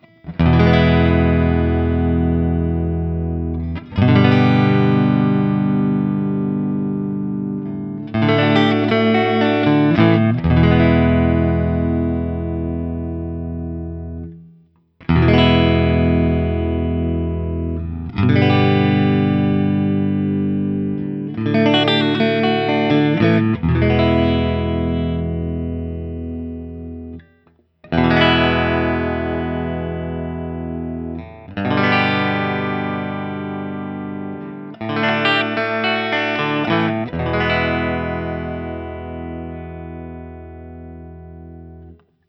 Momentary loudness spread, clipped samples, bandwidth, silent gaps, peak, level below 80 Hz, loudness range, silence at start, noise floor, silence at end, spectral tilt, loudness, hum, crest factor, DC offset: 16 LU; under 0.1%; 6 kHz; none; 0 dBFS; -32 dBFS; 7 LU; 0.25 s; -56 dBFS; 0.35 s; -8.5 dB/octave; -18 LUFS; none; 18 dB; under 0.1%